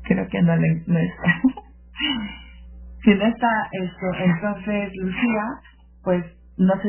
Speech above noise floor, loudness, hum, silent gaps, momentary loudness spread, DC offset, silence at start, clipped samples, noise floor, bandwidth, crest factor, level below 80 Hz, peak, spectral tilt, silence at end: 20 dB; -22 LUFS; none; none; 12 LU; under 0.1%; 0 s; under 0.1%; -41 dBFS; 3.2 kHz; 20 dB; -44 dBFS; -2 dBFS; -10.5 dB/octave; 0 s